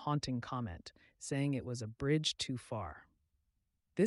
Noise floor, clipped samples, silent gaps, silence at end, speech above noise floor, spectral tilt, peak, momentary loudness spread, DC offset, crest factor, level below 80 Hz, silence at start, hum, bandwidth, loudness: -82 dBFS; under 0.1%; none; 0 s; 44 dB; -5 dB/octave; -18 dBFS; 15 LU; under 0.1%; 20 dB; -62 dBFS; 0 s; none; 11.5 kHz; -38 LUFS